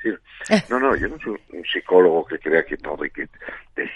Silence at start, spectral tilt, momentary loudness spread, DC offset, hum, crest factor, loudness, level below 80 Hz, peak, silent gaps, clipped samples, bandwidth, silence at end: 0 s; -5 dB/octave; 16 LU; under 0.1%; none; 20 dB; -21 LUFS; -46 dBFS; -2 dBFS; none; under 0.1%; 11 kHz; 0 s